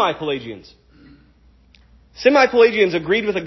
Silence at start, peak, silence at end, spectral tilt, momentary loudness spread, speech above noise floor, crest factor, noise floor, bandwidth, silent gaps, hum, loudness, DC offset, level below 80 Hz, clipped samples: 0 s; 0 dBFS; 0 s; -5 dB/octave; 16 LU; 35 dB; 18 dB; -52 dBFS; 6.2 kHz; none; none; -16 LUFS; under 0.1%; -52 dBFS; under 0.1%